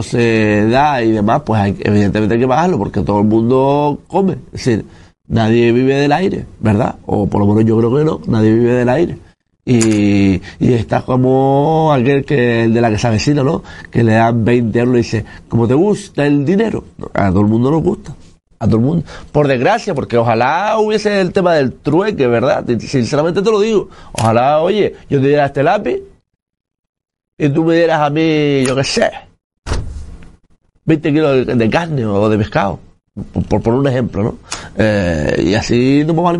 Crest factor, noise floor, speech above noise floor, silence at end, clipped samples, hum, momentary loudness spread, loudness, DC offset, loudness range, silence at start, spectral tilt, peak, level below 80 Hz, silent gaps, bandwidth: 14 dB; -36 dBFS; 23 dB; 0 s; under 0.1%; none; 8 LU; -14 LUFS; under 0.1%; 3 LU; 0 s; -7 dB/octave; 0 dBFS; -38 dBFS; 26.42-26.46 s, 26.79-26.83 s, 26.89-26.93 s, 27.28-27.37 s, 29.44-29.50 s, 29.58-29.62 s; 11.5 kHz